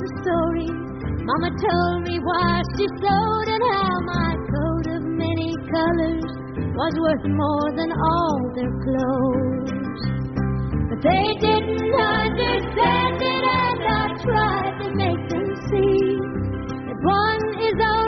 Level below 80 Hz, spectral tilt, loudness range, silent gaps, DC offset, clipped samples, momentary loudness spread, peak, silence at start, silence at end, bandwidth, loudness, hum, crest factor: -38 dBFS; -5 dB/octave; 3 LU; none; under 0.1%; under 0.1%; 7 LU; -6 dBFS; 0 s; 0 s; 6.4 kHz; -22 LUFS; none; 14 dB